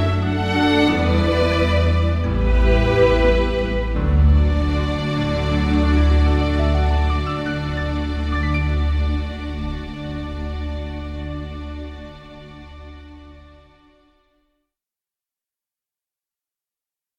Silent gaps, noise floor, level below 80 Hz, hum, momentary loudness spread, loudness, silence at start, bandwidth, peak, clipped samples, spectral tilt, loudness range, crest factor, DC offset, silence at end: none; -90 dBFS; -22 dBFS; none; 16 LU; -20 LUFS; 0 s; 8 kHz; -2 dBFS; under 0.1%; -7.5 dB/octave; 15 LU; 18 dB; under 0.1%; 3.8 s